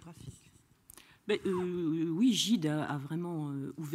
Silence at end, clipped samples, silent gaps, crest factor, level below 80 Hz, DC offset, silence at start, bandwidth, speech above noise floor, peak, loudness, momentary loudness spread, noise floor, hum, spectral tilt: 0 s; under 0.1%; none; 16 dB; -70 dBFS; under 0.1%; 0 s; 15.5 kHz; 32 dB; -18 dBFS; -32 LUFS; 20 LU; -64 dBFS; none; -5 dB/octave